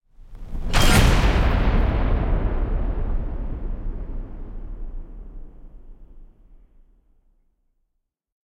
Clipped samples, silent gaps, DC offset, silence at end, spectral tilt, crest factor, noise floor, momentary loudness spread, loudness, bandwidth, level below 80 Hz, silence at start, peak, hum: under 0.1%; none; under 0.1%; 2.3 s; -5 dB/octave; 20 dB; -76 dBFS; 23 LU; -23 LUFS; 16.5 kHz; -24 dBFS; 0.2 s; -4 dBFS; none